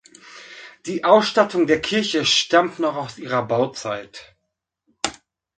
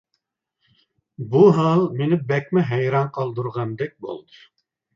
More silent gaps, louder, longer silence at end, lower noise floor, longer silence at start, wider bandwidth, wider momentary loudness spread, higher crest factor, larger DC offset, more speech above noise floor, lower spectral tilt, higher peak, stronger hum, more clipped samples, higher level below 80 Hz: neither; about the same, -20 LUFS vs -20 LUFS; second, 0.45 s vs 0.75 s; about the same, -78 dBFS vs -76 dBFS; second, 0.25 s vs 1.2 s; first, 9.4 kHz vs 7.4 kHz; first, 22 LU vs 19 LU; about the same, 22 dB vs 20 dB; neither; about the same, 58 dB vs 56 dB; second, -3.5 dB/octave vs -9 dB/octave; about the same, 0 dBFS vs -2 dBFS; neither; neither; about the same, -60 dBFS vs -64 dBFS